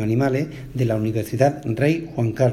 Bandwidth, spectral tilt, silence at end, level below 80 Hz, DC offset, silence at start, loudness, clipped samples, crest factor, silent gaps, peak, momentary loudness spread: 15 kHz; -8 dB/octave; 0 s; -48 dBFS; under 0.1%; 0 s; -22 LUFS; under 0.1%; 18 dB; none; -2 dBFS; 5 LU